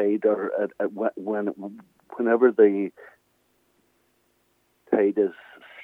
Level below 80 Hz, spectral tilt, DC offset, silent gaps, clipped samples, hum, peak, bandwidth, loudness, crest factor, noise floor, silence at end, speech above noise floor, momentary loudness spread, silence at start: -82 dBFS; -9 dB/octave; under 0.1%; none; under 0.1%; none; -6 dBFS; 3.7 kHz; -24 LUFS; 20 dB; -68 dBFS; 0 s; 44 dB; 14 LU; 0 s